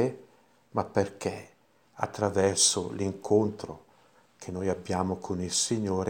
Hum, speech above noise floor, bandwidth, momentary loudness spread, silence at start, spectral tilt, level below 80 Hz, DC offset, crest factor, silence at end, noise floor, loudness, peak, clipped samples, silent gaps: none; 33 dB; 17 kHz; 19 LU; 0 s; -3.5 dB/octave; -62 dBFS; under 0.1%; 22 dB; 0 s; -62 dBFS; -28 LUFS; -8 dBFS; under 0.1%; none